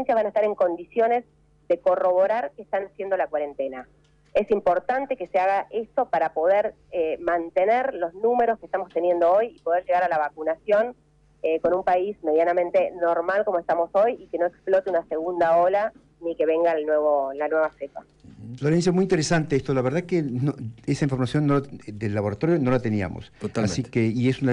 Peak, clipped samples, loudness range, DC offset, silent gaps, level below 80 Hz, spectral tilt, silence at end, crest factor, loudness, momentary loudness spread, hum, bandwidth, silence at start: -12 dBFS; under 0.1%; 2 LU; under 0.1%; none; -56 dBFS; -6.5 dB/octave; 0 s; 12 dB; -24 LUFS; 8 LU; none; 10.5 kHz; 0 s